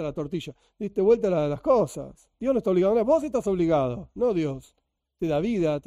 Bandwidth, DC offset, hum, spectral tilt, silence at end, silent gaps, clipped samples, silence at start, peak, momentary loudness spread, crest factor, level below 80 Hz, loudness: 14 kHz; under 0.1%; none; -7.5 dB/octave; 0.05 s; none; under 0.1%; 0 s; -10 dBFS; 13 LU; 16 dB; -52 dBFS; -25 LUFS